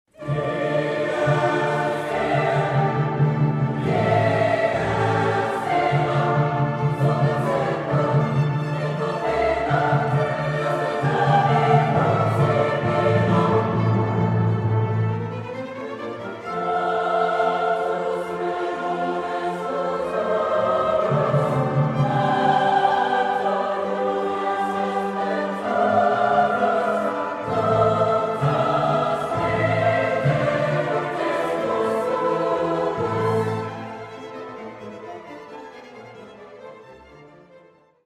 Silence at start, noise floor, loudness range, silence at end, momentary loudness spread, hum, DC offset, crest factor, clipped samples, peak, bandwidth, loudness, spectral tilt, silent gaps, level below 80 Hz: 0.2 s; -53 dBFS; 4 LU; 0.5 s; 12 LU; none; under 0.1%; 18 dB; under 0.1%; -4 dBFS; 11.5 kHz; -21 LUFS; -7.5 dB/octave; none; -52 dBFS